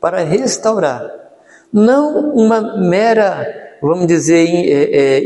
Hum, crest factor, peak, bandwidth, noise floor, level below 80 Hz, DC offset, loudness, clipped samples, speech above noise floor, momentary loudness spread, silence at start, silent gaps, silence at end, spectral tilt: none; 12 dB; 0 dBFS; 11.5 kHz; -43 dBFS; -58 dBFS; under 0.1%; -13 LUFS; under 0.1%; 31 dB; 9 LU; 0 s; none; 0 s; -5.5 dB/octave